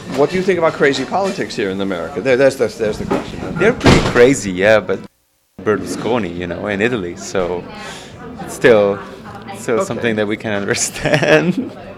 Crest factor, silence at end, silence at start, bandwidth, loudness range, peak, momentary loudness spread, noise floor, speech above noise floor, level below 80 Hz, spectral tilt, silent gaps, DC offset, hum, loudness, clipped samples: 16 dB; 0 s; 0 s; 15.5 kHz; 5 LU; 0 dBFS; 14 LU; -48 dBFS; 33 dB; -38 dBFS; -5 dB/octave; none; under 0.1%; none; -16 LUFS; under 0.1%